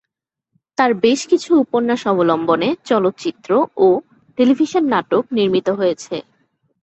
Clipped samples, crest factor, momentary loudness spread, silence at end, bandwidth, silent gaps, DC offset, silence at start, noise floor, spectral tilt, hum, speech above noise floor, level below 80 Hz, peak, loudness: under 0.1%; 16 dB; 8 LU; 0.65 s; 8.2 kHz; none; under 0.1%; 0.8 s; -81 dBFS; -5.5 dB/octave; none; 65 dB; -62 dBFS; -2 dBFS; -17 LUFS